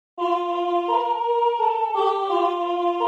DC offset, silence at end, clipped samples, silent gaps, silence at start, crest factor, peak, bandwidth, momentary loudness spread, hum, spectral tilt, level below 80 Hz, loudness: under 0.1%; 0 s; under 0.1%; none; 0.15 s; 12 dB; -10 dBFS; 8 kHz; 2 LU; none; -3.5 dB/octave; -84 dBFS; -22 LUFS